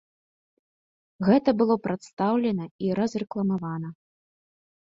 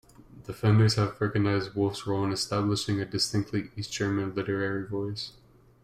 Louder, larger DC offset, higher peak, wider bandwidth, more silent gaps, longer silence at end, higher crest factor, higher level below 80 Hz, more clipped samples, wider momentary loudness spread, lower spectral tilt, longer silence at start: about the same, -26 LUFS vs -28 LUFS; neither; first, -6 dBFS vs -12 dBFS; second, 7.8 kHz vs 13 kHz; first, 2.13-2.17 s, 2.71-2.79 s vs none; first, 1 s vs 0.55 s; about the same, 20 dB vs 16 dB; second, -64 dBFS vs -58 dBFS; neither; about the same, 11 LU vs 11 LU; first, -8 dB/octave vs -5.5 dB/octave; first, 1.2 s vs 0.2 s